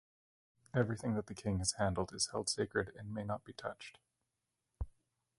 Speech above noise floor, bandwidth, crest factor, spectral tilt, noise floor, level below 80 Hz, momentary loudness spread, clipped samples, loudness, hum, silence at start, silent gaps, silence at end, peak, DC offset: 50 dB; 11.5 kHz; 22 dB; -4 dB/octave; -88 dBFS; -56 dBFS; 14 LU; under 0.1%; -38 LUFS; none; 0.75 s; none; 0.5 s; -18 dBFS; under 0.1%